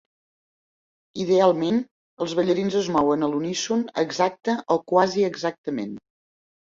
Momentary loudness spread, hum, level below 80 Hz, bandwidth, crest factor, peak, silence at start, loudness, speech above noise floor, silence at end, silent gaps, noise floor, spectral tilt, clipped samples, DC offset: 12 LU; none; -64 dBFS; 7.6 kHz; 20 dB; -4 dBFS; 1.15 s; -23 LUFS; over 68 dB; 0.8 s; 1.91-2.17 s, 5.58-5.64 s; under -90 dBFS; -5 dB/octave; under 0.1%; under 0.1%